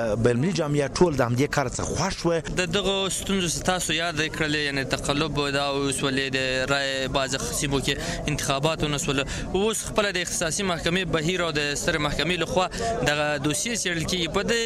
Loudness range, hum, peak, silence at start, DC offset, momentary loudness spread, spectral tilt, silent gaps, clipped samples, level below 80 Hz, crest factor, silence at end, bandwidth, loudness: 1 LU; none; -10 dBFS; 0 s; under 0.1%; 3 LU; -3.5 dB/octave; none; under 0.1%; -40 dBFS; 16 dB; 0 s; 15.5 kHz; -24 LUFS